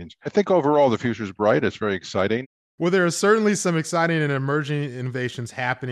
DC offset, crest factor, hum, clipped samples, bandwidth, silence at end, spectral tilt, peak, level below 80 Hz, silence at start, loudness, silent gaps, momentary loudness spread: under 0.1%; 16 dB; none; under 0.1%; 13 kHz; 0 s; -5.5 dB/octave; -6 dBFS; -64 dBFS; 0 s; -22 LUFS; 2.46-2.78 s; 9 LU